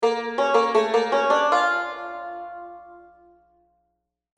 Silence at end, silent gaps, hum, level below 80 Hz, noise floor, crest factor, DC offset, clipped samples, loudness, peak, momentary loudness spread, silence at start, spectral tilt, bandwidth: 1.35 s; none; 60 Hz at -70 dBFS; -70 dBFS; -76 dBFS; 18 dB; under 0.1%; under 0.1%; -21 LUFS; -6 dBFS; 17 LU; 0 s; -2.5 dB/octave; 10 kHz